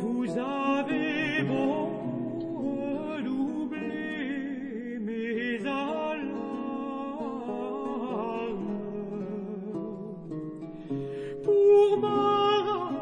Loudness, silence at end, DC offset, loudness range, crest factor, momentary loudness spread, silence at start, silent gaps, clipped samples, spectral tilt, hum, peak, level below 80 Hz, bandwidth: -29 LUFS; 0 s; under 0.1%; 8 LU; 16 dB; 12 LU; 0 s; none; under 0.1%; -7 dB/octave; none; -12 dBFS; -66 dBFS; 9.4 kHz